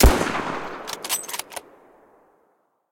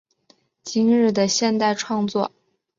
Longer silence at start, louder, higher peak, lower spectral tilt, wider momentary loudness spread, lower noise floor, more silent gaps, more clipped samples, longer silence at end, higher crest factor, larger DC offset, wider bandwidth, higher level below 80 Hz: second, 0 s vs 0.65 s; second, -26 LUFS vs -20 LUFS; about the same, -6 dBFS vs -6 dBFS; about the same, -4 dB/octave vs -4 dB/octave; first, 13 LU vs 10 LU; first, -66 dBFS vs -60 dBFS; neither; neither; first, 1.3 s vs 0.5 s; about the same, 18 dB vs 14 dB; neither; first, 17 kHz vs 7.6 kHz; first, -28 dBFS vs -66 dBFS